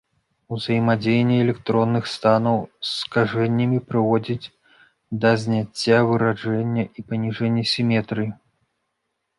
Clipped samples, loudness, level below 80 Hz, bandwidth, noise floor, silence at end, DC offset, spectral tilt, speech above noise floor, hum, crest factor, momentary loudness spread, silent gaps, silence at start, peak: under 0.1%; -21 LUFS; -58 dBFS; 11.5 kHz; -76 dBFS; 1.05 s; under 0.1%; -6.5 dB/octave; 56 dB; none; 18 dB; 9 LU; none; 0.5 s; -4 dBFS